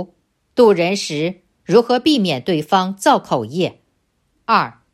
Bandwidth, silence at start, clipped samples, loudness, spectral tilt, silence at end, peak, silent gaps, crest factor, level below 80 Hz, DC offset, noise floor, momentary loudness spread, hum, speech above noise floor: 14.5 kHz; 0 s; under 0.1%; -17 LUFS; -5 dB/octave; 0.2 s; -2 dBFS; none; 16 dB; -60 dBFS; under 0.1%; -65 dBFS; 11 LU; none; 50 dB